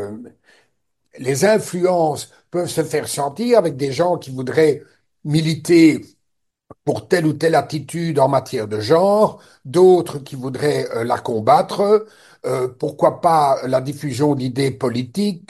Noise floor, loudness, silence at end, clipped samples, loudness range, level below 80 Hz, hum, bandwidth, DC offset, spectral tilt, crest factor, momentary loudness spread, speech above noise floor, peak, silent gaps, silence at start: -74 dBFS; -18 LUFS; 0.1 s; under 0.1%; 3 LU; -60 dBFS; none; 12.5 kHz; under 0.1%; -6 dB/octave; 18 dB; 12 LU; 57 dB; 0 dBFS; none; 0 s